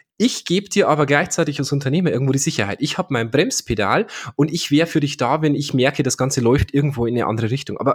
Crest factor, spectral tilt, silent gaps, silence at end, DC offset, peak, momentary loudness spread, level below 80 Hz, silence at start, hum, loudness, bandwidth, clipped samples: 18 dB; -5 dB/octave; none; 0 s; under 0.1%; -2 dBFS; 5 LU; -42 dBFS; 0.2 s; none; -19 LUFS; 17.5 kHz; under 0.1%